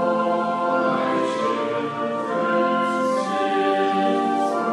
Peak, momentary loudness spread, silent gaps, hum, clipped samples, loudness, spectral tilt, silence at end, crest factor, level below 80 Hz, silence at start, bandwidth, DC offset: -8 dBFS; 4 LU; none; none; under 0.1%; -22 LUFS; -5.5 dB/octave; 0 s; 14 dB; -76 dBFS; 0 s; 12 kHz; under 0.1%